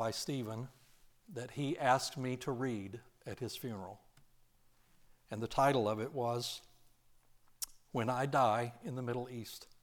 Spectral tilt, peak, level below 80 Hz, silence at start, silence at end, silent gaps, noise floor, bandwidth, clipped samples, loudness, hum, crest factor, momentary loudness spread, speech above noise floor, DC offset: -5 dB/octave; -16 dBFS; -66 dBFS; 0 s; 0.1 s; none; -68 dBFS; 19 kHz; under 0.1%; -37 LUFS; none; 22 dB; 17 LU; 31 dB; under 0.1%